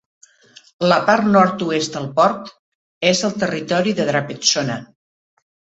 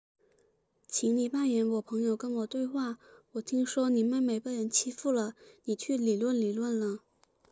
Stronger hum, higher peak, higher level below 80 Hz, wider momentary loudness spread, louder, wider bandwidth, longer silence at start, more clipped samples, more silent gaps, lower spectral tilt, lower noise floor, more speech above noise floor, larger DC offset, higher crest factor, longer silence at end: neither; first, 0 dBFS vs -14 dBFS; first, -60 dBFS vs -82 dBFS; about the same, 8 LU vs 9 LU; first, -17 LUFS vs -31 LUFS; about the same, 8.2 kHz vs 8 kHz; about the same, 0.8 s vs 0.9 s; neither; first, 2.59-3.01 s vs none; about the same, -4 dB/octave vs -4 dB/octave; second, -49 dBFS vs -71 dBFS; second, 32 dB vs 41 dB; neither; about the same, 20 dB vs 16 dB; first, 0.95 s vs 0.55 s